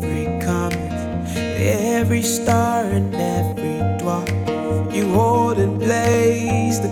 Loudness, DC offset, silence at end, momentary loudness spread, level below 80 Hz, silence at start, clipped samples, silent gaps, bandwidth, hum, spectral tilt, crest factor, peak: -19 LUFS; under 0.1%; 0 s; 7 LU; -40 dBFS; 0 s; under 0.1%; none; 17 kHz; none; -6 dB/octave; 14 dB; -4 dBFS